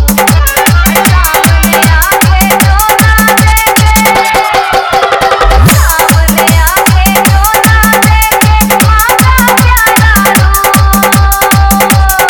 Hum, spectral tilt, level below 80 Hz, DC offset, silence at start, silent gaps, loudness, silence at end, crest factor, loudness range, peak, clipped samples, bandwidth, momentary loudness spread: none; -4 dB/octave; -12 dBFS; under 0.1%; 0 s; none; -5 LUFS; 0 s; 6 dB; 1 LU; 0 dBFS; 4%; over 20 kHz; 2 LU